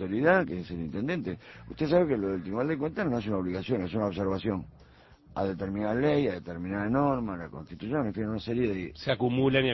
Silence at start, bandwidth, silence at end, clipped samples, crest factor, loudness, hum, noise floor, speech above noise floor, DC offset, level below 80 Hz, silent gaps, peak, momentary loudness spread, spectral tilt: 0 s; 6 kHz; 0 s; under 0.1%; 20 dB; -30 LUFS; none; -55 dBFS; 26 dB; under 0.1%; -52 dBFS; none; -10 dBFS; 12 LU; -8.5 dB/octave